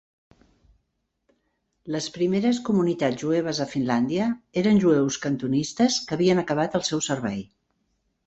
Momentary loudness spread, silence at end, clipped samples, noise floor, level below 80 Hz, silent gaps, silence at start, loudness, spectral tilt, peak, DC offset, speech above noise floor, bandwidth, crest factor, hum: 7 LU; 0.85 s; under 0.1%; -76 dBFS; -60 dBFS; none; 1.85 s; -24 LUFS; -5 dB/octave; -8 dBFS; under 0.1%; 53 dB; 8.2 kHz; 16 dB; none